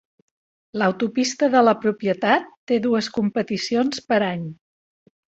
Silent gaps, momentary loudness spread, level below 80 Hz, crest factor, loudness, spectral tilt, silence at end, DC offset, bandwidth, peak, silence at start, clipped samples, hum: 2.57-2.67 s; 8 LU; -64 dBFS; 20 dB; -21 LUFS; -5 dB/octave; 0.75 s; under 0.1%; 8.2 kHz; -2 dBFS; 0.75 s; under 0.1%; none